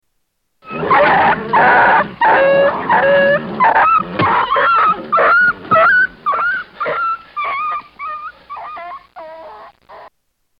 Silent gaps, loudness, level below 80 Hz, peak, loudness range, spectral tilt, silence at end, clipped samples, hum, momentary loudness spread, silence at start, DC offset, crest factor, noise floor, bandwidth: none; -13 LUFS; -50 dBFS; -2 dBFS; 11 LU; -7.5 dB/octave; 0.5 s; under 0.1%; none; 19 LU; 0.65 s; under 0.1%; 12 dB; -68 dBFS; 5.4 kHz